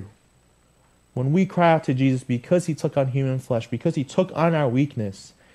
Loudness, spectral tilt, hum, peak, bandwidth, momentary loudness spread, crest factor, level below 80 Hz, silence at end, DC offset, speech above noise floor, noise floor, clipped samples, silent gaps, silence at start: -22 LUFS; -7.5 dB/octave; none; -4 dBFS; 12 kHz; 9 LU; 18 dB; -60 dBFS; 0.25 s; under 0.1%; 38 dB; -59 dBFS; under 0.1%; none; 0 s